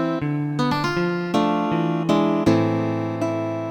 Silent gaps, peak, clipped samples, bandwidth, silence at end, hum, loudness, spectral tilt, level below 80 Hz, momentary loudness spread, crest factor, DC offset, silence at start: none; -6 dBFS; under 0.1%; 16.5 kHz; 0 s; none; -22 LUFS; -7 dB/octave; -54 dBFS; 6 LU; 16 dB; under 0.1%; 0 s